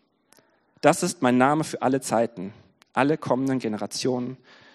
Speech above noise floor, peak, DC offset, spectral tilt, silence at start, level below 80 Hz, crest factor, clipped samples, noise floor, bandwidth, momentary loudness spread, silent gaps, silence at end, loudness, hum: 38 dB; -2 dBFS; under 0.1%; -5 dB/octave; 0.85 s; -70 dBFS; 22 dB; under 0.1%; -61 dBFS; 13 kHz; 11 LU; none; 0.4 s; -24 LUFS; none